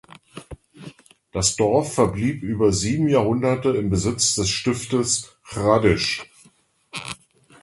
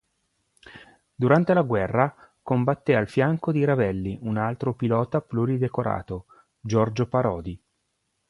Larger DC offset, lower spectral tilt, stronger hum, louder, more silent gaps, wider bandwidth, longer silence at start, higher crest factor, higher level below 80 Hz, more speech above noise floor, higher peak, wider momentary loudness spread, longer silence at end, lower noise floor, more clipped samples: neither; second, -4.5 dB/octave vs -8.5 dB/octave; neither; first, -21 LUFS vs -24 LUFS; neither; about the same, 11.5 kHz vs 11 kHz; second, 0.35 s vs 0.65 s; about the same, 20 dB vs 20 dB; first, -42 dBFS vs -52 dBFS; second, 38 dB vs 52 dB; about the same, -2 dBFS vs -4 dBFS; first, 17 LU vs 11 LU; second, 0.45 s vs 0.75 s; second, -58 dBFS vs -75 dBFS; neither